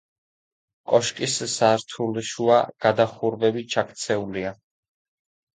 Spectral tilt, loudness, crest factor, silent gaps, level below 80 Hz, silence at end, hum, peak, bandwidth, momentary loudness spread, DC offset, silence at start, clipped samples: -4 dB/octave; -23 LUFS; 20 dB; none; -62 dBFS; 1.05 s; none; -4 dBFS; 9.6 kHz; 8 LU; under 0.1%; 0.9 s; under 0.1%